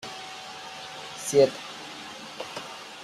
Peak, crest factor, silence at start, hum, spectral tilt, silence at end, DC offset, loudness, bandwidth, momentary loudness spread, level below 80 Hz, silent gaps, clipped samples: -8 dBFS; 22 dB; 0 s; none; -3.5 dB/octave; 0 s; under 0.1%; -30 LUFS; 14.5 kHz; 17 LU; -70 dBFS; none; under 0.1%